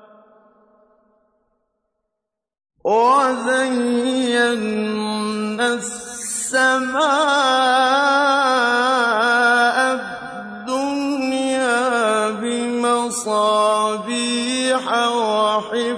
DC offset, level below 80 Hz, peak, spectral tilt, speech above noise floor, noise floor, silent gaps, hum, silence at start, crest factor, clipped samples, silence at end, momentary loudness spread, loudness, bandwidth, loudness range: under 0.1%; -64 dBFS; -4 dBFS; -2.5 dB/octave; 64 dB; -81 dBFS; none; none; 2.85 s; 16 dB; under 0.1%; 0 s; 8 LU; -18 LUFS; 11 kHz; 5 LU